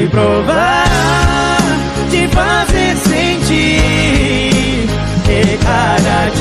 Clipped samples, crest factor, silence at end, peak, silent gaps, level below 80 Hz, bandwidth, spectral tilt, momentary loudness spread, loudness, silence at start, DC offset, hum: under 0.1%; 10 dB; 0 s; -2 dBFS; none; -20 dBFS; 15.5 kHz; -5 dB/octave; 4 LU; -12 LUFS; 0 s; under 0.1%; none